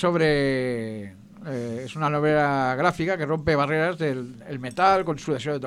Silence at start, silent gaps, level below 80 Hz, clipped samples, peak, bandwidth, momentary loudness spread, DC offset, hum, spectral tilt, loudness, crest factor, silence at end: 0 s; none; -50 dBFS; under 0.1%; -6 dBFS; 12 kHz; 14 LU; under 0.1%; none; -6.5 dB/octave; -24 LUFS; 18 dB; 0 s